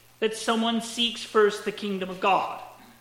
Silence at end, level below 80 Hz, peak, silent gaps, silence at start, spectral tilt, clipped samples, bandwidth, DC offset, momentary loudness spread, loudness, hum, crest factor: 0.15 s; -66 dBFS; -10 dBFS; none; 0.2 s; -3.5 dB/octave; under 0.1%; 16.5 kHz; under 0.1%; 9 LU; -26 LUFS; none; 16 dB